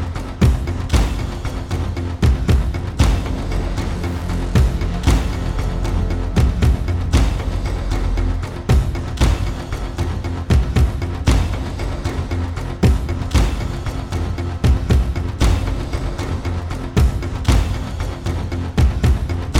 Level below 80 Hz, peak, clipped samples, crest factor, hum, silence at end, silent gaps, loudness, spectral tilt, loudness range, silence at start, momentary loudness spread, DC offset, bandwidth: -20 dBFS; -4 dBFS; under 0.1%; 14 dB; none; 0 s; none; -20 LUFS; -6.5 dB/octave; 1 LU; 0 s; 7 LU; under 0.1%; 15 kHz